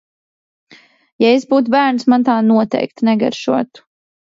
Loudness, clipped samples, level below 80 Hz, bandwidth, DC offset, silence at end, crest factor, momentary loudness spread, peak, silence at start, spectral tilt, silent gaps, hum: -14 LUFS; under 0.1%; -64 dBFS; 7.6 kHz; under 0.1%; 0.7 s; 14 dB; 6 LU; 0 dBFS; 1.2 s; -6 dB/octave; none; none